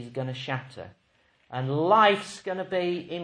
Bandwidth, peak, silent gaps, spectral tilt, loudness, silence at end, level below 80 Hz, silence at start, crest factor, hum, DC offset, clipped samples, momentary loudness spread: 10.5 kHz; -6 dBFS; none; -5.5 dB/octave; -26 LUFS; 0 s; -70 dBFS; 0 s; 22 dB; none; under 0.1%; under 0.1%; 21 LU